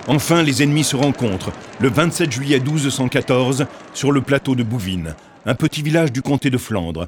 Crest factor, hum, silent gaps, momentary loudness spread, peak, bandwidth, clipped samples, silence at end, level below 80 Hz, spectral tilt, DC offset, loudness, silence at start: 18 dB; none; none; 9 LU; 0 dBFS; 18.5 kHz; under 0.1%; 0 s; -46 dBFS; -5 dB/octave; under 0.1%; -18 LUFS; 0 s